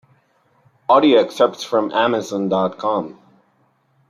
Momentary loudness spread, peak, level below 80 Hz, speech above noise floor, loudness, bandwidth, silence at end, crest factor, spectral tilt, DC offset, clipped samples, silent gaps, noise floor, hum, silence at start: 10 LU; -2 dBFS; -68 dBFS; 44 dB; -17 LUFS; 14 kHz; 1 s; 16 dB; -5 dB/octave; under 0.1%; under 0.1%; none; -61 dBFS; none; 0.9 s